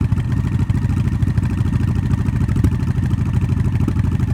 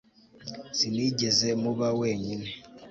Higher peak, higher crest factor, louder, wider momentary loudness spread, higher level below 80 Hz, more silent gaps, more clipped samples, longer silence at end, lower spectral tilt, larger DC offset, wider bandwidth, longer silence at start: first, -4 dBFS vs -10 dBFS; about the same, 14 dB vs 18 dB; first, -19 LUFS vs -27 LUFS; second, 1 LU vs 18 LU; first, -26 dBFS vs -62 dBFS; neither; neither; about the same, 0 s vs 0 s; first, -8.5 dB/octave vs -4 dB/octave; neither; first, 11 kHz vs 8 kHz; second, 0 s vs 0.4 s